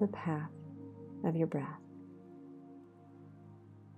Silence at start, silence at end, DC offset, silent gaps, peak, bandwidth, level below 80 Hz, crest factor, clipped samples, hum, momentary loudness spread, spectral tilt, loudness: 0 s; 0 s; under 0.1%; none; -20 dBFS; 8.4 kHz; -78 dBFS; 20 dB; under 0.1%; 50 Hz at -70 dBFS; 22 LU; -10 dB/octave; -39 LUFS